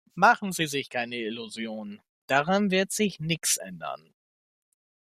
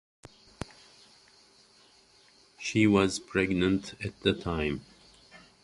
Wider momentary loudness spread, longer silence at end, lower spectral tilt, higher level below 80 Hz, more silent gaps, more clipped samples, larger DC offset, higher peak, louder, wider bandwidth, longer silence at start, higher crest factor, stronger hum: second, 16 LU vs 20 LU; first, 1.2 s vs 0.25 s; second, -3.5 dB/octave vs -5.5 dB/octave; second, -68 dBFS vs -52 dBFS; first, 2.09-2.28 s vs none; neither; neither; about the same, -6 dBFS vs -8 dBFS; about the same, -26 LUFS vs -28 LUFS; first, 15 kHz vs 11.5 kHz; second, 0.15 s vs 2.6 s; about the same, 22 dB vs 22 dB; neither